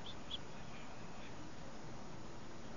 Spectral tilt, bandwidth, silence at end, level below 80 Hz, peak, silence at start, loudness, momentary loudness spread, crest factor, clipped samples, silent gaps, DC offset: -3.5 dB/octave; 7.2 kHz; 0 s; -62 dBFS; -30 dBFS; 0 s; -51 LUFS; 5 LU; 18 dB; under 0.1%; none; 0.5%